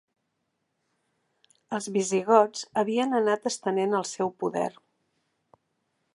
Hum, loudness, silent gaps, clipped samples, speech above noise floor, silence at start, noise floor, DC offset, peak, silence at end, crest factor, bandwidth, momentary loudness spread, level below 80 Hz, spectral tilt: none; -26 LUFS; none; under 0.1%; 53 dB; 1.7 s; -78 dBFS; under 0.1%; -6 dBFS; 1.45 s; 24 dB; 11.5 kHz; 10 LU; -78 dBFS; -4.5 dB/octave